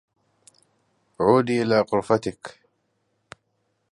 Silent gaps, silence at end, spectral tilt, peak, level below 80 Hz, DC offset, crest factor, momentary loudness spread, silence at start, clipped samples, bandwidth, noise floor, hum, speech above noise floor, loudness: none; 1.4 s; -6.5 dB/octave; -4 dBFS; -60 dBFS; under 0.1%; 22 dB; 18 LU; 1.2 s; under 0.1%; 11.5 kHz; -72 dBFS; none; 51 dB; -22 LUFS